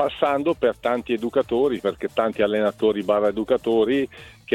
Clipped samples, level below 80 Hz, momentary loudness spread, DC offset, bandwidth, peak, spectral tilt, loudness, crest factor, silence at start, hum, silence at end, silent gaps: under 0.1%; -54 dBFS; 5 LU; under 0.1%; 13.5 kHz; -6 dBFS; -6.5 dB/octave; -22 LUFS; 16 dB; 0 s; none; 0 s; none